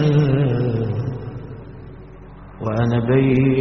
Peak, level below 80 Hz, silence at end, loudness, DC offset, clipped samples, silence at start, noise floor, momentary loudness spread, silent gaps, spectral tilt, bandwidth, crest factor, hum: -4 dBFS; -42 dBFS; 0 s; -19 LUFS; 0.2%; under 0.1%; 0 s; -39 dBFS; 24 LU; none; -8 dB/octave; 6 kHz; 16 dB; none